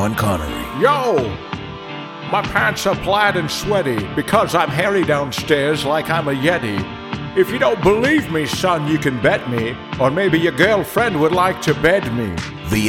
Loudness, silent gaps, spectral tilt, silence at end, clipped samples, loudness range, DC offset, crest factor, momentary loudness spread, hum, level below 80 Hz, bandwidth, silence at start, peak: -17 LUFS; none; -5 dB/octave; 0 s; under 0.1%; 2 LU; under 0.1%; 18 dB; 9 LU; none; -40 dBFS; 17.5 kHz; 0 s; 0 dBFS